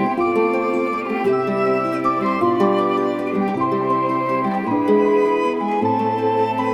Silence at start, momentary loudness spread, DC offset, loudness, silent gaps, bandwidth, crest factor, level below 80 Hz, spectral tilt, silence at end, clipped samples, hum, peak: 0 s; 4 LU; under 0.1%; -19 LUFS; none; 11 kHz; 14 dB; -62 dBFS; -7.5 dB/octave; 0 s; under 0.1%; none; -4 dBFS